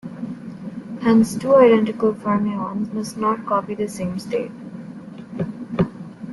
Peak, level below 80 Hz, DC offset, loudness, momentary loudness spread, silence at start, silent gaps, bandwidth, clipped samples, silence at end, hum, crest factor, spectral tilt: -4 dBFS; -56 dBFS; under 0.1%; -20 LUFS; 20 LU; 0.05 s; none; 12 kHz; under 0.1%; 0 s; none; 18 dB; -7 dB/octave